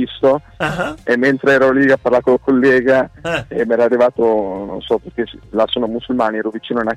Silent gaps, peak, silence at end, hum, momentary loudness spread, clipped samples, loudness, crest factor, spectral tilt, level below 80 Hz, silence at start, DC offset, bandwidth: none; -4 dBFS; 0 s; none; 10 LU; under 0.1%; -16 LUFS; 12 dB; -6 dB/octave; -46 dBFS; 0 s; under 0.1%; 11.5 kHz